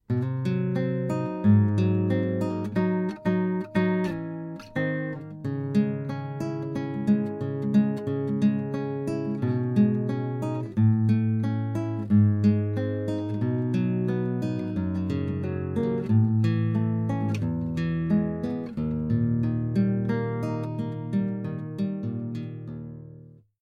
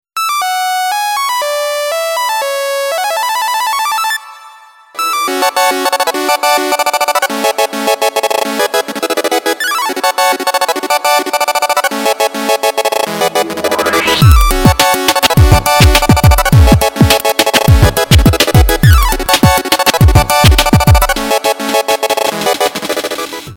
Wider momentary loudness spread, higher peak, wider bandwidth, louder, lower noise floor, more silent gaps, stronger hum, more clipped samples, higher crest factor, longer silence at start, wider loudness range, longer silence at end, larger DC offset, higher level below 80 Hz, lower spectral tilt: about the same, 9 LU vs 7 LU; second, -10 dBFS vs 0 dBFS; second, 7.2 kHz vs 19 kHz; second, -26 LUFS vs -11 LUFS; first, -49 dBFS vs -38 dBFS; neither; neither; second, under 0.1% vs 0.6%; first, 16 dB vs 10 dB; about the same, 0.1 s vs 0.15 s; about the same, 4 LU vs 6 LU; first, 0.35 s vs 0 s; neither; second, -54 dBFS vs -18 dBFS; first, -9.5 dB/octave vs -4 dB/octave